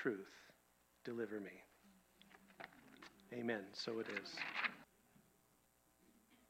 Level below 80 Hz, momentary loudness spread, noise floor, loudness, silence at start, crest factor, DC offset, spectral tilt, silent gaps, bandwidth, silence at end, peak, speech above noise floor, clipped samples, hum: -86 dBFS; 21 LU; -76 dBFS; -47 LUFS; 0 s; 26 dB; under 0.1%; -4.5 dB/octave; none; 16 kHz; 0.15 s; -24 dBFS; 30 dB; under 0.1%; none